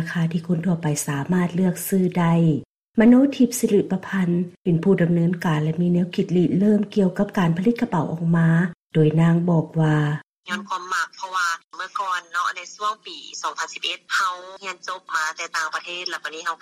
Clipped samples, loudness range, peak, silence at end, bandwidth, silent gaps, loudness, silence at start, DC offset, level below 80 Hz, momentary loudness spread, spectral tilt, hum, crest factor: under 0.1%; 7 LU; -6 dBFS; 0.05 s; 15.5 kHz; 2.65-2.93 s, 4.60-4.65 s, 8.76-8.90 s, 10.27-10.43 s, 11.64-11.70 s; -22 LUFS; 0 s; under 0.1%; -58 dBFS; 10 LU; -6 dB/octave; none; 16 dB